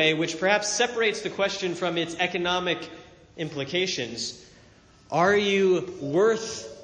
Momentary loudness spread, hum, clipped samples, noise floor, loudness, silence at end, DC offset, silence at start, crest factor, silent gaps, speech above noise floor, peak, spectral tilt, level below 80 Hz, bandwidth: 11 LU; none; under 0.1%; -54 dBFS; -25 LUFS; 0 s; under 0.1%; 0 s; 20 dB; none; 29 dB; -6 dBFS; -3.5 dB/octave; -62 dBFS; 10 kHz